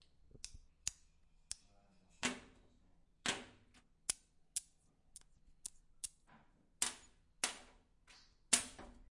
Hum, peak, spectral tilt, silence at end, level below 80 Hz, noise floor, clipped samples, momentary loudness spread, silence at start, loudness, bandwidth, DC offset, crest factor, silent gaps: none; -10 dBFS; 0 dB/octave; 0.1 s; -68 dBFS; -71 dBFS; under 0.1%; 23 LU; 0.35 s; -42 LUFS; 11.5 kHz; under 0.1%; 38 dB; none